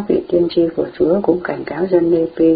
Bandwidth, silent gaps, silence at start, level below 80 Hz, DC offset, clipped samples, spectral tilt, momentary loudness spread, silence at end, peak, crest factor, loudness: 4.9 kHz; none; 0 s; -48 dBFS; under 0.1%; under 0.1%; -12 dB/octave; 6 LU; 0 s; 0 dBFS; 14 dB; -16 LUFS